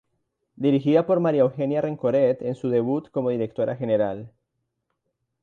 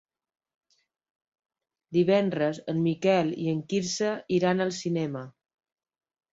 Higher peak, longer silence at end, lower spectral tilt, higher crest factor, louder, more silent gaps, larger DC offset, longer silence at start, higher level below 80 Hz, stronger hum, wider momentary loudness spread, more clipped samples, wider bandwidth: about the same, -8 dBFS vs -10 dBFS; about the same, 1.15 s vs 1.05 s; first, -9.5 dB/octave vs -5.5 dB/octave; about the same, 16 dB vs 18 dB; first, -23 LUFS vs -27 LUFS; neither; neither; second, 0.6 s vs 1.9 s; about the same, -66 dBFS vs -70 dBFS; neither; about the same, 7 LU vs 7 LU; neither; second, 7 kHz vs 8 kHz